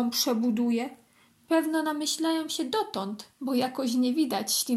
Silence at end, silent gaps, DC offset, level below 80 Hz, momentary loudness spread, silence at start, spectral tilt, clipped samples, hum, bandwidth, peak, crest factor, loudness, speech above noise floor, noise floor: 0 s; none; under 0.1%; -78 dBFS; 7 LU; 0 s; -3 dB/octave; under 0.1%; none; 15.5 kHz; -12 dBFS; 16 dB; -28 LUFS; 34 dB; -61 dBFS